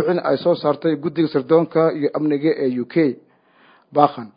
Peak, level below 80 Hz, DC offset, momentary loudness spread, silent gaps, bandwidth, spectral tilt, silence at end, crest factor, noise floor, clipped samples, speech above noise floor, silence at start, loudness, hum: 0 dBFS; -68 dBFS; under 0.1%; 5 LU; none; 5.2 kHz; -12 dB/octave; 0.1 s; 18 dB; -54 dBFS; under 0.1%; 36 dB; 0 s; -19 LUFS; none